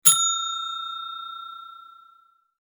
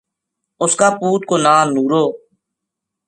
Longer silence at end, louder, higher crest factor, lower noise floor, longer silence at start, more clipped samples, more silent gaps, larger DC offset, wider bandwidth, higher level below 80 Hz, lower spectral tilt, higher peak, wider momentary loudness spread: second, 0.7 s vs 0.9 s; second, -24 LUFS vs -15 LUFS; first, 26 dB vs 18 dB; second, -59 dBFS vs -80 dBFS; second, 0.05 s vs 0.6 s; neither; neither; neither; first, over 20 kHz vs 11.5 kHz; second, -86 dBFS vs -66 dBFS; second, 2.5 dB/octave vs -4 dB/octave; about the same, 0 dBFS vs 0 dBFS; first, 23 LU vs 7 LU